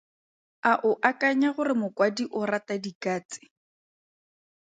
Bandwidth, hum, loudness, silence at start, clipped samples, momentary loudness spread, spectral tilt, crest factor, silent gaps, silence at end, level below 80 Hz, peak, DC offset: 9.2 kHz; none; -26 LUFS; 0.65 s; under 0.1%; 10 LU; -5 dB/octave; 22 dB; 2.95-3.01 s, 3.25-3.29 s; 1.4 s; -78 dBFS; -6 dBFS; under 0.1%